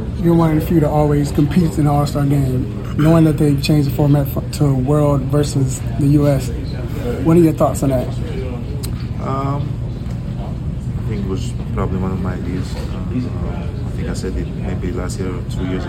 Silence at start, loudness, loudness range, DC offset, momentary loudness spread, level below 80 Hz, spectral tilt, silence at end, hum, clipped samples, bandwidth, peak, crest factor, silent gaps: 0 s; -18 LUFS; 7 LU; under 0.1%; 10 LU; -28 dBFS; -7.5 dB/octave; 0 s; none; under 0.1%; 17 kHz; -2 dBFS; 16 dB; none